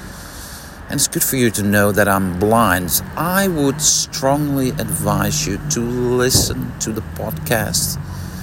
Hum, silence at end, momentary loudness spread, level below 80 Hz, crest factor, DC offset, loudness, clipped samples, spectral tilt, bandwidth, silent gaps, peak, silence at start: none; 0 s; 12 LU; -38 dBFS; 18 dB; under 0.1%; -17 LUFS; under 0.1%; -3.5 dB/octave; 16.5 kHz; none; 0 dBFS; 0 s